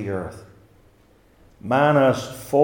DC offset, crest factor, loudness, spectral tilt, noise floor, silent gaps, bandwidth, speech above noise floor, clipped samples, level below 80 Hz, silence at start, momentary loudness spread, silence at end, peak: under 0.1%; 18 dB; -20 LUFS; -6.5 dB/octave; -56 dBFS; none; 18 kHz; 36 dB; under 0.1%; -56 dBFS; 0 s; 19 LU; 0 s; -4 dBFS